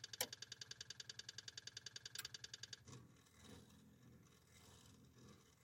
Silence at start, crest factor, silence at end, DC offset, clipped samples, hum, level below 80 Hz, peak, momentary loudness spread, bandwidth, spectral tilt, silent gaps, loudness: 0 s; 32 dB; 0 s; under 0.1%; under 0.1%; none; -84 dBFS; -26 dBFS; 18 LU; 16.5 kHz; -1 dB/octave; none; -53 LUFS